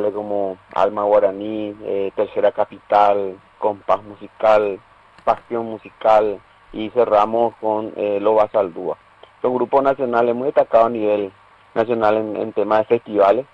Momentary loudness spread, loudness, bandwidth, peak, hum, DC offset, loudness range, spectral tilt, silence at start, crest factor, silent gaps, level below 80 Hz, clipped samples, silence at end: 11 LU; -19 LUFS; 7.2 kHz; -4 dBFS; none; under 0.1%; 2 LU; -7.5 dB/octave; 0 s; 16 dB; none; -56 dBFS; under 0.1%; 0.1 s